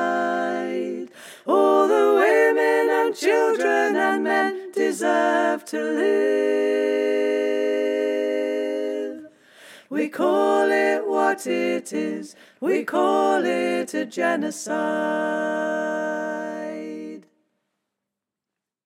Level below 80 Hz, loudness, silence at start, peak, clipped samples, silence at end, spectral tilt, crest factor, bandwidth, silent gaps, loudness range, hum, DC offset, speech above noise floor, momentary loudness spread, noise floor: -86 dBFS; -22 LUFS; 0 s; -6 dBFS; under 0.1%; 1.65 s; -4 dB/octave; 16 dB; 15.5 kHz; none; 6 LU; none; under 0.1%; 64 dB; 12 LU; -86 dBFS